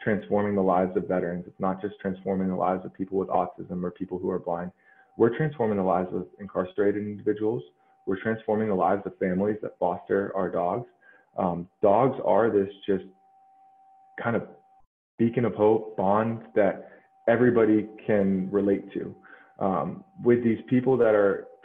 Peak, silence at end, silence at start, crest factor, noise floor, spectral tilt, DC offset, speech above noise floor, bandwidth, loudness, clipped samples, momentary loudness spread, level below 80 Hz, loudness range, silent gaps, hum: -8 dBFS; 0.15 s; 0 s; 18 dB; -58 dBFS; -10.5 dB/octave; under 0.1%; 33 dB; 3.8 kHz; -26 LUFS; under 0.1%; 11 LU; -64 dBFS; 5 LU; 14.87-15.18 s; none